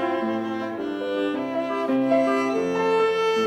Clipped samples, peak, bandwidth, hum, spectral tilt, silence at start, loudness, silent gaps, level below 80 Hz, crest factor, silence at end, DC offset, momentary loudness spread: under 0.1%; -8 dBFS; 12.5 kHz; none; -5.5 dB/octave; 0 s; -24 LUFS; none; -68 dBFS; 14 dB; 0 s; under 0.1%; 8 LU